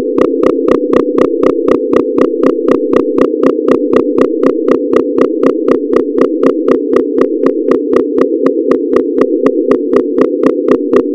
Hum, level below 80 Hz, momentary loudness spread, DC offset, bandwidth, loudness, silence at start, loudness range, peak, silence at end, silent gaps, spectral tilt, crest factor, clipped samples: none; -46 dBFS; 2 LU; under 0.1%; 11 kHz; -11 LUFS; 0 s; 1 LU; 0 dBFS; 0 s; none; -7.5 dB/octave; 10 dB; 3%